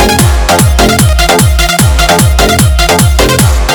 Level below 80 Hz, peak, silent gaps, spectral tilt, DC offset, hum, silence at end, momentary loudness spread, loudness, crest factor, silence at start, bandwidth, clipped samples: -12 dBFS; 0 dBFS; none; -4 dB/octave; under 0.1%; none; 0 s; 1 LU; -7 LUFS; 6 dB; 0 s; over 20 kHz; 2%